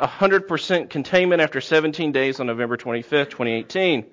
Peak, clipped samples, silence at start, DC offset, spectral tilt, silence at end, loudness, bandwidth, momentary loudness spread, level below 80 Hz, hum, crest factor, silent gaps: -6 dBFS; under 0.1%; 0 s; under 0.1%; -5.5 dB/octave; 0.05 s; -21 LUFS; 7.6 kHz; 7 LU; -62 dBFS; none; 16 dB; none